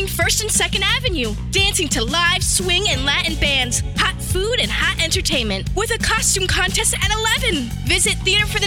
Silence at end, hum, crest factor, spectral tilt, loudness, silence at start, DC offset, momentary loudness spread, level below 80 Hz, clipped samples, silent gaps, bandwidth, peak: 0 s; none; 14 dB; -2.5 dB/octave; -17 LUFS; 0 s; under 0.1%; 4 LU; -28 dBFS; under 0.1%; none; 18 kHz; -4 dBFS